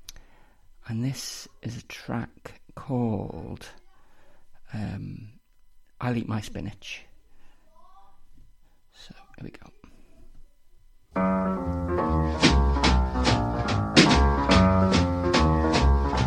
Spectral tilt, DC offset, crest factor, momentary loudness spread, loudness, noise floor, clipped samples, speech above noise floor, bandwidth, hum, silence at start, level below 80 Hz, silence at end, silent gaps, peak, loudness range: -5.5 dB/octave; under 0.1%; 24 dB; 21 LU; -24 LUFS; -54 dBFS; under 0.1%; 22 dB; 12.5 kHz; none; 0.1 s; -32 dBFS; 0 s; none; -2 dBFS; 15 LU